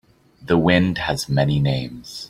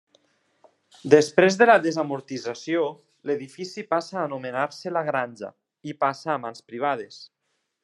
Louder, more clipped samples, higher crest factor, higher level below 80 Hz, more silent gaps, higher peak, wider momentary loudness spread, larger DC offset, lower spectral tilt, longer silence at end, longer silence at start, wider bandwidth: first, -19 LUFS vs -23 LUFS; neither; second, 18 dB vs 24 dB; first, -44 dBFS vs -78 dBFS; neither; about the same, -2 dBFS vs -2 dBFS; second, 8 LU vs 21 LU; neither; about the same, -6 dB/octave vs -5 dB/octave; second, 0 s vs 0.6 s; second, 0.45 s vs 1.05 s; first, 14.5 kHz vs 11.5 kHz